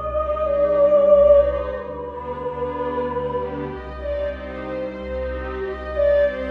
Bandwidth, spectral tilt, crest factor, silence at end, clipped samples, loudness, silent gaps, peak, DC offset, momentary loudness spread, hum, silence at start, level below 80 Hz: 4.6 kHz; -8.5 dB/octave; 16 dB; 0 s; under 0.1%; -21 LUFS; none; -4 dBFS; under 0.1%; 16 LU; none; 0 s; -36 dBFS